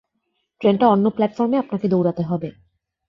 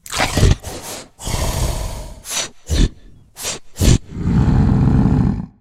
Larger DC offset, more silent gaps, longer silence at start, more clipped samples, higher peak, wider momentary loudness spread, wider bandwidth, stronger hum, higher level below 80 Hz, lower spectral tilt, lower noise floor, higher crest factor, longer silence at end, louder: neither; neither; first, 0.6 s vs 0.1 s; neither; second, -4 dBFS vs 0 dBFS; second, 9 LU vs 14 LU; second, 6 kHz vs 16 kHz; neither; second, -60 dBFS vs -22 dBFS; first, -9.5 dB/octave vs -5 dB/octave; first, -73 dBFS vs -41 dBFS; about the same, 18 dB vs 16 dB; first, 0.6 s vs 0.1 s; about the same, -19 LUFS vs -18 LUFS